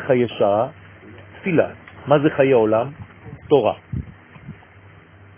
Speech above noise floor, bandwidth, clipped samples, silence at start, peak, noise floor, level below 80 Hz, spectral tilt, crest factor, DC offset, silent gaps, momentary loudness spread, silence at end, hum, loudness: 29 dB; 3.6 kHz; under 0.1%; 0 s; 0 dBFS; -46 dBFS; -48 dBFS; -11 dB/octave; 20 dB; under 0.1%; none; 24 LU; 0.85 s; none; -19 LUFS